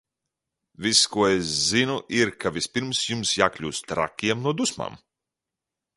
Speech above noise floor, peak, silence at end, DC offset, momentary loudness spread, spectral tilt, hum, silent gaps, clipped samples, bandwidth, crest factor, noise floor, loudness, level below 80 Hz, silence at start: 63 dB; -2 dBFS; 1 s; under 0.1%; 9 LU; -3 dB/octave; none; none; under 0.1%; 11.5 kHz; 24 dB; -87 dBFS; -23 LUFS; -56 dBFS; 0.8 s